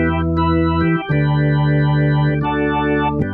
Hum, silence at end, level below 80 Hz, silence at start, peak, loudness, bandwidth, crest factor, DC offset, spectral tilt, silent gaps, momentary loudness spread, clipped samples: none; 0 s; -32 dBFS; 0 s; -4 dBFS; -17 LUFS; 4.2 kHz; 12 dB; under 0.1%; -10.5 dB/octave; none; 2 LU; under 0.1%